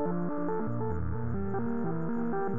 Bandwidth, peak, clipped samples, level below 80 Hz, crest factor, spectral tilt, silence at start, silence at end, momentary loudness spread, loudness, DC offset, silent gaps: 2.9 kHz; -18 dBFS; under 0.1%; -52 dBFS; 12 dB; -12.5 dB/octave; 0 s; 0 s; 2 LU; -33 LUFS; 2%; none